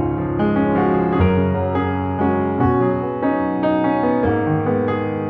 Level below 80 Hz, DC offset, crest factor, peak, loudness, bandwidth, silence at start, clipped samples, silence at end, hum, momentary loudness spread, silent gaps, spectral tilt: -38 dBFS; under 0.1%; 12 dB; -4 dBFS; -18 LUFS; 5 kHz; 0 s; under 0.1%; 0 s; none; 4 LU; none; -11 dB/octave